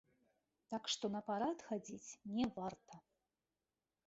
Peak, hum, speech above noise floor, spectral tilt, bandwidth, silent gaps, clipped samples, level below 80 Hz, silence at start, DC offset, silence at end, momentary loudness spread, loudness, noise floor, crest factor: -28 dBFS; none; over 47 dB; -3.5 dB/octave; 8 kHz; none; under 0.1%; -76 dBFS; 0.7 s; under 0.1%; 1.05 s; 15 LU; -43 LUFS; under -90 dBFS; 18 dB